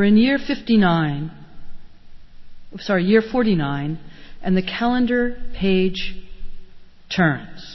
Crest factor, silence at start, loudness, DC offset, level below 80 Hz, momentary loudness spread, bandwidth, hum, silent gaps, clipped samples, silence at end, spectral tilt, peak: 16 dB; 0 s; -20 LUFS; under 0.1%; -40 dBFS; 15 LU; 6 kHz; none; none; under 0.1%; 0 s; -7.5 dB/octave; -4 dBFS